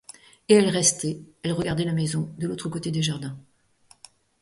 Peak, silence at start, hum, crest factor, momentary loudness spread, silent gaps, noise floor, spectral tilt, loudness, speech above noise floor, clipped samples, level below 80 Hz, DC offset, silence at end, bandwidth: -6 dBFS; 0.5 s; none; 20 dB; 14 LU; none; -59 dBFS; -4.5 dB/octave; -24 LUFS; 35 dB; under 0.1%; -58 dBFS; under 0.1%; 1 s; 11.5 kHz